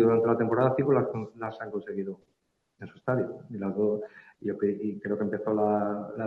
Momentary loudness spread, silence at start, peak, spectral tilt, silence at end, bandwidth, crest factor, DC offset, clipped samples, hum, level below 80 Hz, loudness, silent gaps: 13 LU; 0 s; -12 dBFS; -10.5 dB/octave; 0 s; 4.6 kHz; 18 dB; under 0.1%; under 0.1%; none; -70 dBFS; -29 LUFS; none